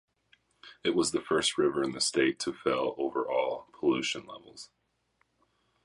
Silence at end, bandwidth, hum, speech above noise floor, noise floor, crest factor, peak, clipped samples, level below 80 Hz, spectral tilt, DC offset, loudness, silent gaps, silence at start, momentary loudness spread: 1.2 s; 11.5 kHz; none; 44 dB; -74 dBFS; 20 dB; -12 dBFS; under 0.1%; -68 dBFS; -3 dB/octave; under 0.1%; -30 LUFS; none; 0.65 s; 18 LU